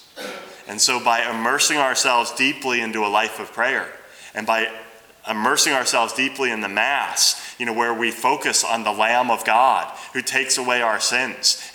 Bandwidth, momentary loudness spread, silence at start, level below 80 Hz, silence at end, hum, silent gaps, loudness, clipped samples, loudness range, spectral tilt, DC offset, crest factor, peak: over 20 kHz; 11 LU; 0.15 s; -72 dBFS; 0 s; none; none; -19 LUFS; under 0.1%; 3 LU; -0.5 dB/octave; under 0.1%; 18 dB; -2 dBFS